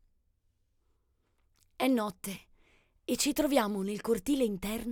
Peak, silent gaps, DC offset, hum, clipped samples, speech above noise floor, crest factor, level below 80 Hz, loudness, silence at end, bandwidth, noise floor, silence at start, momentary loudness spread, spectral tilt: -12 dBFS; none; under 0.1%; none; under 0.1%; 43 dB; 22 dB; -56 dBFS; -31 LUFS; 0 s; 19 kHz; -74 dBFS; 1.8 s; 13 LU; -4 dB/octave